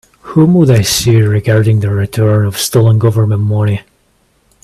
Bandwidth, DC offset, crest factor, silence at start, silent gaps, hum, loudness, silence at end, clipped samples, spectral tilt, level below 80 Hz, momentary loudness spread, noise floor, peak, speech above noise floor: 14 kHz; under 0.1%; 10 dB; 0.25 s; none; none; -11 LUFS; 0.85 s; under 0.1%; -6 dB/octave; -42 dBFS; 6 LU; -55 dBFS; 0 dBFS; 45 dB